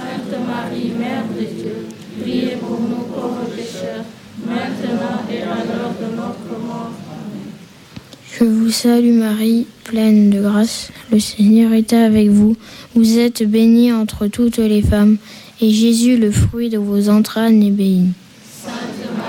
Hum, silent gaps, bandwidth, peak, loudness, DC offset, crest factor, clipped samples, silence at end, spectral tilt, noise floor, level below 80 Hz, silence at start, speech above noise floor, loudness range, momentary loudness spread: none; none; 16.5 kHz; -2 dBFS; -15 LUFS; under 0.1%; 12 dB; under 0.1%; 0 s; -6 dB/octave; -38 dBFS; -38 dBFS; 0 s; 23 dB; 10 LU; 15 LU